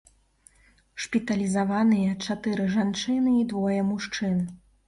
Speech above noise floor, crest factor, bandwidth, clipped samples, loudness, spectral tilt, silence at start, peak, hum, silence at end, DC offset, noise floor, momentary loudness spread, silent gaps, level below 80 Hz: 36 dB; 14 dB; 11.5 kHz; under 0.1%; -26 LUFS; -6 dB/octave; 0.95 s; -12 dBFS; none; 0.3 s; under 0.1%; -61 dBFS; 7 LU; none; -58 dBFS